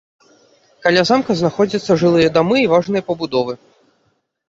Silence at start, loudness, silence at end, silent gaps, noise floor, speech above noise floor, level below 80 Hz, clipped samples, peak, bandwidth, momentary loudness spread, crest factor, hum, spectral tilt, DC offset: 0.85 s; -16 LUFS; 0.95 s; none; -64 dBFS; 49 dB; -54 dBFS; under 0.1%; 0 dBFS; 7.8 kHz; 7 LU; 16 dB; none; -6 dB/octave; under 0.1%